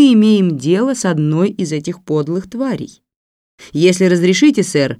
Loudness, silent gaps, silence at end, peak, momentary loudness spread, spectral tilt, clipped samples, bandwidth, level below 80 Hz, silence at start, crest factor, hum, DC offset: -14 LUFS; 3.16-3.58 s; 0.05 s; 0 dBFS; 10 LU; -6 dB/octave; under 0.1%; 13 kHz; -58 dBFS; 0 s; 14 dB; none; under 0.1%